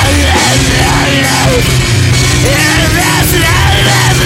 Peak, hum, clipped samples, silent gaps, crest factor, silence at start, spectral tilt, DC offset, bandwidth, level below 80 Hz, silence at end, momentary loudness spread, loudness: 0 dBFS; none; 0.2%; none; 8 dB; 0 s; -3.5 dB/octave; under 0.1%; 16.5 kHz; -18 dBFS; 0 s; 1 LU; -8 LUFS